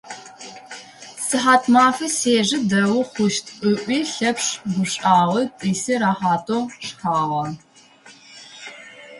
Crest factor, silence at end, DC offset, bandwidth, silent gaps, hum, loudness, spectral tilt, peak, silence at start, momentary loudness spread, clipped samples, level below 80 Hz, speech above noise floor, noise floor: 20 dB; 0 s; under 0.1%; 11.5 kHz; none; none; -19 LUFS; -4 dB/octave; -2 dBFS; 0.05 s; 21 LU; under 0.1%; -64 dBFS; 29 dB; -48 dBFS